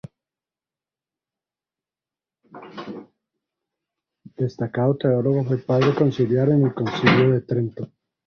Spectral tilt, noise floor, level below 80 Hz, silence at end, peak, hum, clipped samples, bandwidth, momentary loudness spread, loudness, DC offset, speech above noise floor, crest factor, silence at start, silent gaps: -8.5 dB/octave; under -90 dBFS; -58 dBFS; 0.4 s; -2 dBFS; none; under 0.1%; 6.6 kHz; 19 LU; -20 LUFS; under 0.1%; over 70 dB; 22 dB; 2.55 s; none